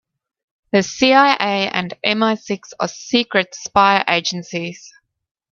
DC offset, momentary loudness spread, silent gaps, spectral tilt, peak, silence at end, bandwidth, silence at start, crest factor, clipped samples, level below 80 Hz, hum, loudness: under 0.1%; 12 LU; none; -3.5 dB/octave; 0 dBFS; 0.65 s; 7.4 kHz; 0.75 s; 18 dB; under 0.1%; -58 dBFS; none; -17 LUFS